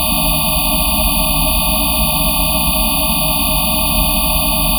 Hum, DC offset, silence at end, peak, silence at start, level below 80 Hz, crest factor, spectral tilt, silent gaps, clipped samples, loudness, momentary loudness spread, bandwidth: none; under 0.1%; 0 s; 0 dBFS; 0 s; -22 dBFS; 14 dB; -2.5 dB/octave; none; under 0.1%; -13 LUFS; 0 LU; 19.5 kHz